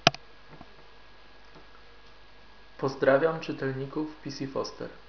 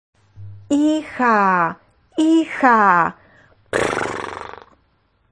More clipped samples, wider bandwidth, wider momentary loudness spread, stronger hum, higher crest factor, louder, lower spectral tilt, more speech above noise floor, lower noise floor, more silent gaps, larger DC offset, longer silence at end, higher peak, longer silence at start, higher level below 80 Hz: neither; second, 5.4 kHz vs 10.5 kHz; first, 28 LU vs 15 LU; neither; first, 32 dB vs 18 dB; second, -29 LUFS vs -17 LUFS; second, -3 dB/octave vs -5 dB/octave; second, 25 dB vs 46 dB; second, -55 dBFS vs -62 dBFS; neither; first, 0.3% vs under 0.1%; second, 0.1 s vs 0.8 s; about the same, 0 dBFS vs -2 dBFS; second, 0.05 s vs 0.4 s; about the same, -60 dBFS vs -56 dBFS